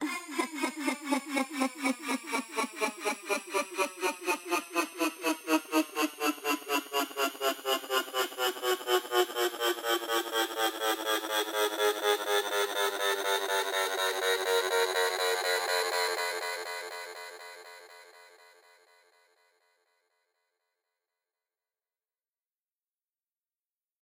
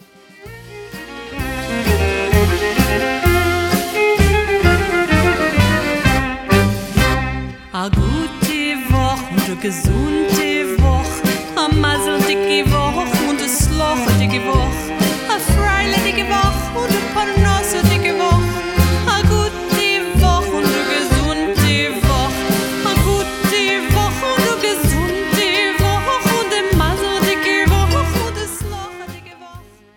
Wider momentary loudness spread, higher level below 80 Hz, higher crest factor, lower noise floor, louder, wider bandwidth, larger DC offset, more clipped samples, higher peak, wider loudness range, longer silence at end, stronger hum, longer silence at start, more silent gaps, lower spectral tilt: about the same, 6 LU vs 6 LU; second, -88 dBFS vs -24 dBFS; first, 22 dB vs 16 dB; first, under -90 dBFS vs -40 dBFS; second, -30 LUFS vs -16 LUFS; second, 17 kHz vs 19 kHz; neither; neither; second, -10 dBFS vs 0 dBFS; about the same, 5 LU vs 3 LU; first, 5.75 s vs 0.35 s; neither; second, 0 s vs 0.4 s; neither; second, 0 dB/octave vs -4.5 dB/octave